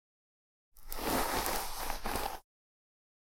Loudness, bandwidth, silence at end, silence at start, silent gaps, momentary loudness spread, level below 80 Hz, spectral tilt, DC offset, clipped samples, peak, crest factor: -36 LUFS; 16.5 kHz; 0.85 s; 0.75 s; none; 11 LU; -46 dBFS; -2.5 dB/octave; under 0.1%; under 0.1%; -12 dBFS; 26 dB